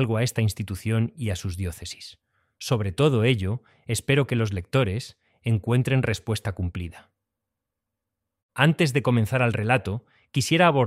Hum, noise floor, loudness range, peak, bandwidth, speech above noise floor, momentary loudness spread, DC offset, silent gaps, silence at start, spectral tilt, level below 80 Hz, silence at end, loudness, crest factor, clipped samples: none; -84 dBFS; 3 LU; -2 dBFS; 15 kHz; 61 dB; 15 LU; under 0.1%; 8.42-8.49 s; 0 s; -6 dB/octave; -50 dBFS; 0 s; -24 LUFS; 22 dB; under 0.1%